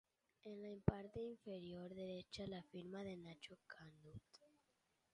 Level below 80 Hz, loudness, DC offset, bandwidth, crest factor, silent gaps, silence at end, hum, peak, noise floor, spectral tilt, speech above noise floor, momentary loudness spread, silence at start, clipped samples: -66 dBFS; -51 LUFS; under 0.1%; 11 kHz; 32 dB; none; 0.65 s; none; -20 dBFS; -85 dBFS; -7 dB/octave; 34 dB; 18 LU; 0.45 s; under 0.1%